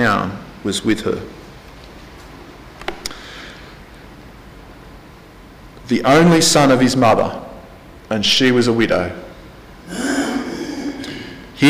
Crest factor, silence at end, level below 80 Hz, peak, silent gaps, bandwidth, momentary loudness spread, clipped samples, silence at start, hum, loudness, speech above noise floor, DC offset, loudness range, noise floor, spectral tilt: 14 dB; 0 s; -44 dBFS; -4 dBFS; none; 15.5 kHz; 27 LU; under 0.1%; 0 s; none; -16 LUFS; 26 dB; under 0.1%; 20 LU; -40 dBFS; -4.5 dB/octave